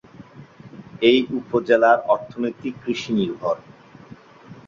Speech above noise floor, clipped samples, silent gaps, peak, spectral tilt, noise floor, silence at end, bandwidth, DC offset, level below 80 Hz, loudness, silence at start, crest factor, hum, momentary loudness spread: 25 dB; under 0.1%; none; -2 dBFS; -6 dB/octave; -45 dBFS; 0.1 s; 7.4 kHz; under 0.1%; -62 dBFS; -21 LUFS; 0.2 s; 20 dB; none; 12 LU